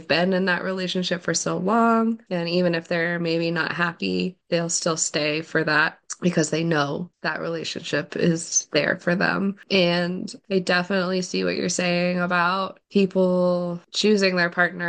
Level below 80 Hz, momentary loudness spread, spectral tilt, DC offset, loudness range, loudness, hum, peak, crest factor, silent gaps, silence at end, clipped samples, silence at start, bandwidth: -68 dBFS; 7 LU; -4 dB/octave; under 0.1%; 2 LU; -23 LUFS; none; -4 dBFS; 18 dB; none; 0 s; under 0.1%; 0 s; 10 kHz